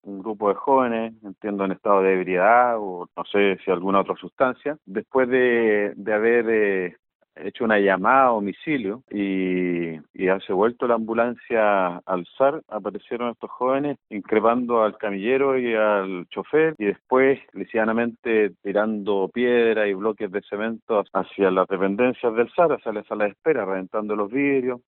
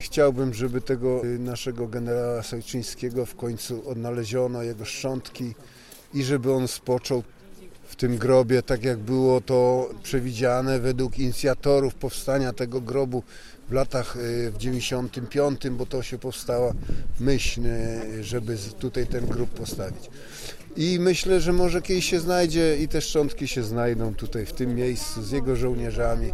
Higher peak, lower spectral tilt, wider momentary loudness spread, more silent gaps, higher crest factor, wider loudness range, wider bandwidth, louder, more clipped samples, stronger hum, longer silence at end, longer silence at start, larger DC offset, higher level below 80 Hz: first, -4 dBFS vs -8 dBFS; about the same, -4.5 dB/octave vs -5.5 dB/octave; about the same, 10 LU vs 11 LU; first, 4.32-4.37 s, 6.99-7.03 s, 7.15-7.20 s, 10.10-10.14 s, 18.19-18.23 s, 20.82-20.87 s vs none; about the same, 18 dB vs 16 dB; second, 2 LU vs 6 LU; second, 4.1 kHz vs 14.5 kHz; first, -22 LUFS vs -26 LUFS; neither; neither; about the same, 0.1 s vs 0 s; about the same, 0.05 s vs 0 s; neither; second, -66 dBFS vs -36 dBFS